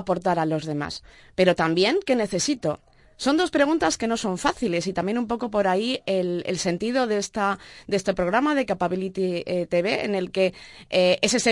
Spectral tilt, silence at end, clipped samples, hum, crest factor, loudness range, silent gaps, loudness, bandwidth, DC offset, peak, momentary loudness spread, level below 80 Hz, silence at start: -4.5 dB/octave; 0 s; under 0.1%; none; 20 dB; 2 LU; none; -24 LUFS; 11.5 kHz; under 0.1%; -4 dBFS; 7 LU; -54 dBFS; 0 s